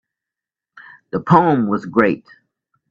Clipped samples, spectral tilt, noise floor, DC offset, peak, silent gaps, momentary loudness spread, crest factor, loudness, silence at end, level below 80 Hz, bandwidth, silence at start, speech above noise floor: under 0.1%; -9 dB/octave; -87 dBFS; under 0.1%; 0 dBFS; none; 14 LU; 20 dB; -17 LUFS; 0.7 s; -56 dBFS; 7.2 kHz; 1.15 s; 71 dB